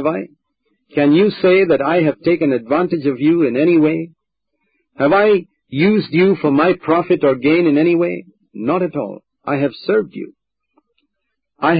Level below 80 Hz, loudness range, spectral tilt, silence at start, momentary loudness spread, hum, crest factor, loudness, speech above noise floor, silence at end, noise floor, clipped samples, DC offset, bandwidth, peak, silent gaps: -60 dBFS; 6 LU; -12 dB/octave; 0 s; 13 LU; none; 12 dB; -15 LUFS; 62 dB; 0 s; -76 dBFS; under 0.1%; under 0.1%; 5 kHz; -4 dBFS; none